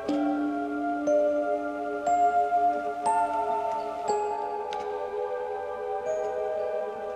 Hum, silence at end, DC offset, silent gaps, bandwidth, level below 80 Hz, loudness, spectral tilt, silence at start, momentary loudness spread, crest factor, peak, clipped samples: none; 0 s; under 0.1%; none; 10.5 kHz; -64 dBFS; -28 LUFS; -5 dB/octave; 0 s; 8 LU; 14 dB; -14 dBFS; under 0.1%